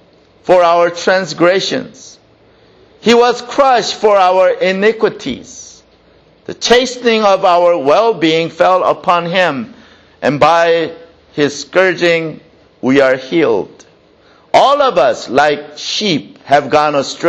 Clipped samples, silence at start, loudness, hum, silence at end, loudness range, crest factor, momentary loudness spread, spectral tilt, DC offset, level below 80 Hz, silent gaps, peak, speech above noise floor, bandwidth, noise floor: under 0.1%; 0.45 s; -12 LUFS; none; 0 s; 2 LU; 12 dB; 12 LU; -4 dB/octave; under 0.1%; -52 dBFS; none; 0 dBFS; 36 dB; 9 kHz; -47 dBFS